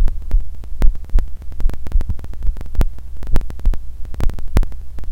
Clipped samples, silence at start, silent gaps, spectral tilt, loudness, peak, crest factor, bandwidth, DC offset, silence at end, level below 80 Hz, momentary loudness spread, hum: 0.4%; 0 s; none; -7 dB/octave; -25 LUFS; 0 dBFS; 14 dB; 4.1 kHz; 8%; 0 s; -16 dBFS; 9 LU; none